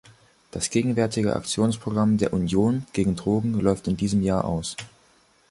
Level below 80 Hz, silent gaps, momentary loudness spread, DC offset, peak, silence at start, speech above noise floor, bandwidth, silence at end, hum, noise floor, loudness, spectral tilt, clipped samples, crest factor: -46 dBFS; none; 6 LU; under 0.1%; -6 dBFS; 0.55 s; 37 dB; 11.5 kHz; 0.65 s; none; -60 dBFS; -24 LUFS; -6 dB/octave; under 0.1%; 18 dB